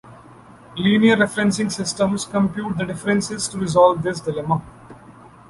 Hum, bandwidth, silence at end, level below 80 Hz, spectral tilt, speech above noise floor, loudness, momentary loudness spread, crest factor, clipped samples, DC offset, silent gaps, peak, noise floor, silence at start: none; 11.5 kHz; 0.25 s; -52 dBFS; -5 dB/octave; 25 dB; -20 LUFS; 9 LU; 18 dB; under 0.1%; under 0.1%; none; -2 dBFS; -45 dBFS; 0.05 s